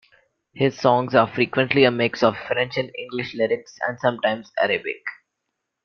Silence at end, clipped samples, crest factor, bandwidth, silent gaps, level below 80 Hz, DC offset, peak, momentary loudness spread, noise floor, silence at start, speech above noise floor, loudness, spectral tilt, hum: 0.7 s; under 0.1%; 22 dB; 6.8 kHz; none; -62 dBFS; under 0.1%; -2 dBFS; 11 LU; -79 dBFS; 0.55 s; 58 dB; -21 LUFS; -6 dB/octave; none